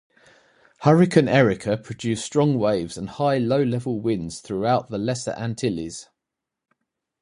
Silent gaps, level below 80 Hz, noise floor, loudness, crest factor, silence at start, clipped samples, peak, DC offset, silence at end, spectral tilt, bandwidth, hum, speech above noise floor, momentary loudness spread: none; -54 dBFS; -85 dBFS; -22 LUFS; 22 dB; 0.8 s; under 0.1%; -2 dBFS; under 0.1%; 1.2 s; -6.5 dB/octave; 11 kHz; none; 63 dB; 12 LU